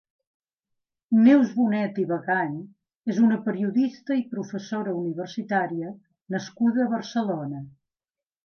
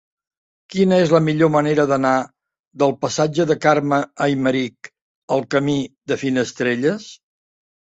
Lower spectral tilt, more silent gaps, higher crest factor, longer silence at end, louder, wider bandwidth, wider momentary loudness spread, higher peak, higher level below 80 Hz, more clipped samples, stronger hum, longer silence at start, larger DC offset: about the same, -7 dB/octave vs -6 dB/octave; second, none vs 2.60-2.71 s, 5.02-5.28 s; about the same, 18 dB vs 18 dB; about the same, 0.75 s vs 0.75 s; second, -25 LUFS vs -19 LUFS; second, 6.6 kHz vs 8.2 kHz; first, 14 LU vs 8 LU; second, -6 dBFS vs -2 dBFS; second, -76 dBFS vs -60 dBFS; neither; neither; first, 1.1 s vs 0.7 s; neither